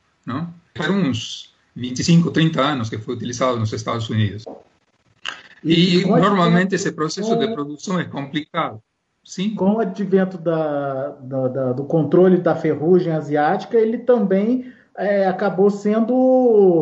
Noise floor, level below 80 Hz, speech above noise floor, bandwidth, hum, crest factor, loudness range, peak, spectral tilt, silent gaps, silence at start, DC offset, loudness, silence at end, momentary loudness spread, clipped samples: -61 dBFS; -60 dBFS; 43 dB; 8 kHz; none; 14 dB; 5 LU; -4 dBFS; -6.5 dB/octave; none; 0.25 s; under 0.1%; -19 LUFS; 0 s; 13 LU; under 0.1%